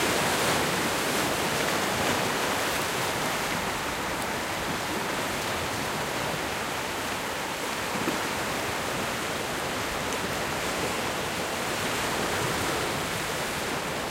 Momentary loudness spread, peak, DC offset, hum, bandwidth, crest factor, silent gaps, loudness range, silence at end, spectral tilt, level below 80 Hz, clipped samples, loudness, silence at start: 4 LU; -12 dBFS; under 0.1%; none; 16 kHz; 16 dB; none; 3 LU; 0 s; -2.5 dB/octave; -50 dBFS; under 0.1%; -28 LUFS; 0 s